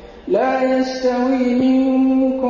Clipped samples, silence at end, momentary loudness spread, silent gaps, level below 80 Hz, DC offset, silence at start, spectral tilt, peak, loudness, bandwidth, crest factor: under 0.1%; 0 s; 4 LU; none; -48 dBFS; under 0.1%; 0 s; -6 dB/octave; -6 dBFS; -17 LUFS; 7.4 kHz; 10 dB